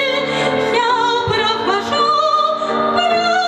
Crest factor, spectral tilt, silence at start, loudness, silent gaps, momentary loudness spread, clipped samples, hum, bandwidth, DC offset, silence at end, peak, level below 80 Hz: 12 dB; -3.5 dB/octave; 0 s; -15 LUFS; none; 3 LU; under 0.1%; none; 12.5 kHz; under 0.1%; 0 s; -4 dBFS; -50 dBFS